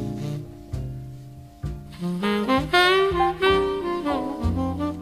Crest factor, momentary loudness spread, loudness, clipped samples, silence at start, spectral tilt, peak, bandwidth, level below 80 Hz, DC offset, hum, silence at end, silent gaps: 18 dB; 18 LU; -23 LUFS; under 0.1%; 0 s; -6 dB/octave; -6 dBFS; 15 kHz; -38 dBFS; under 0.1%; none; 0 s; none